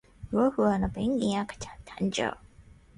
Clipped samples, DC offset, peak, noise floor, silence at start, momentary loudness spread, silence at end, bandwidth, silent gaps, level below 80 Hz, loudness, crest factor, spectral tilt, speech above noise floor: under 0.1%; under 0.1%; -12 dBFS; -54 dBFS; 0.2 s; 16 LU; 0.35 s; 11 kHz; none; -50 dBFS; -29 LUFS; 16 dB; -5.5 dB/octave; 27 dB